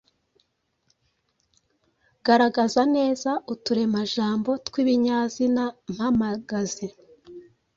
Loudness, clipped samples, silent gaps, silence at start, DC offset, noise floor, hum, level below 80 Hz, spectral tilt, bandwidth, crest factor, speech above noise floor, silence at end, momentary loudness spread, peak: -24 LUFS; under 0.1%; none; 2.25 s; under 0.1%; -73 dBFS; none; -60 dBFS; -5 dB/octave; 7.8 kHz; 18 dB; 50 dB; 0.35 s; 9 LU; -6 dBFS